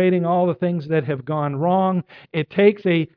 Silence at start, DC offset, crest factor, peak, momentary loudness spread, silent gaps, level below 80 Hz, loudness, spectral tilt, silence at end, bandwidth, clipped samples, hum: 0 s; under 0.1%; 16 dB; -4 dBFS; 8 LU; none; -66 dBFS; -20 LUFS; -10.5 dB/octave; 0.1 s; 5.2 kHz; under 0.1%; none